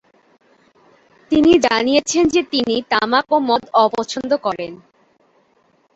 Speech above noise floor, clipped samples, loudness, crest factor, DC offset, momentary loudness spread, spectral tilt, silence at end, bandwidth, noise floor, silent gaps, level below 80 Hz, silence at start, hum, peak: 43 dB; under 0.1%; -16 LUFS; 16 dB; under 0.1%; 9 LU; -3.5 dB/octave; 1.2 s; 8.2 kHz; -59 dBFS; none; -50 dBFS; 1.3 s; none; -2 dBFS